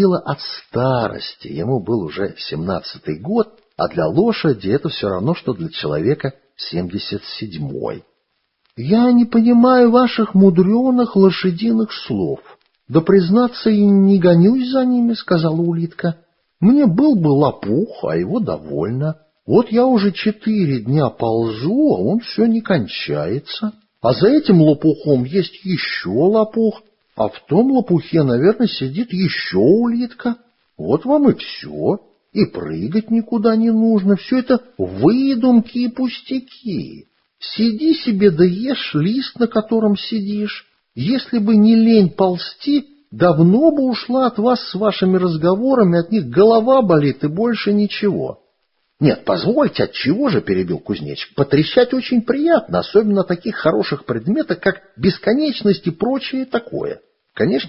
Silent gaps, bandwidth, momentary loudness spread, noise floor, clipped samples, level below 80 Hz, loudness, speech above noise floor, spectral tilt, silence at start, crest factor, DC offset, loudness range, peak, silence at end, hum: none; 5.8 kHz; 12 LU; -69 dBFS; under 0.1%; -50 dBFS; -16 LUFS; 54 dB; -11.5 dB/octave; 0 s; 16 dB; under 0.1%; 5 LU; 0 dBFS; 0 s; none